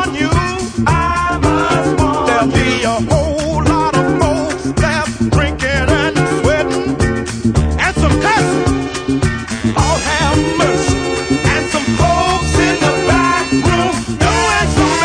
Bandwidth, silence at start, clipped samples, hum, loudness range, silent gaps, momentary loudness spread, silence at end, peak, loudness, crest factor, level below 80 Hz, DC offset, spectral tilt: 10.5 kHz; 0 s; under 0.1%; none; 1 LU; none; 4 LU; 0 s; 0 dBFS; -14 LUFS; 14 dB; -24 dBFS; under 0.1%; -5 dB/octave